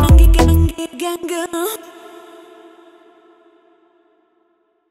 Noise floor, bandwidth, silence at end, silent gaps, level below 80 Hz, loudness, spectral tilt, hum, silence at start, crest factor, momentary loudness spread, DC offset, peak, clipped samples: -62 dBFS; 16 kHz; 3.15 s; none; -18 dBFS; -16 LUFS; -6 dB/octave; none; 0 s; 16 dB; 28 LU; under 0.1%; 0 dBFS; under 0.1%